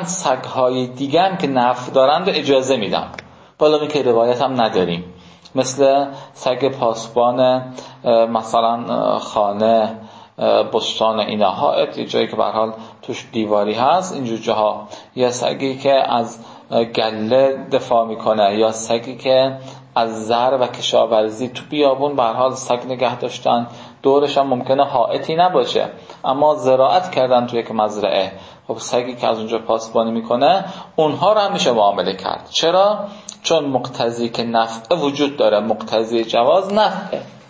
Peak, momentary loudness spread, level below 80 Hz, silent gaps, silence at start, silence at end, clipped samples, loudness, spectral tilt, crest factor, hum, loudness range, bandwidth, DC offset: -2 dBFS; 9 LU; -60 dBFS; none; 0 s; 0.1 s; under 0.1%; -17 LUFS; -4.5 dB/octave; 16 dB; none; 2 LU; 8 kHz; under 0.1%